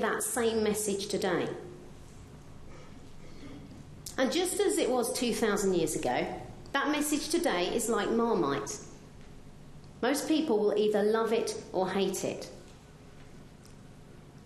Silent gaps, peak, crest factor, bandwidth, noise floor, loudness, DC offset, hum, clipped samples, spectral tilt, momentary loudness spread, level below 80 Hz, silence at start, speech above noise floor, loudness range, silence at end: none; -12 dBFS; 18 dB; 13 kHz; -51 dBFS; -30 LUFS; under 0.1%; none; under 0.1%; -3.5 dB/octave; 23 LU; -54 dBFS; 0 s; 22 dB; 6 LU; 0 s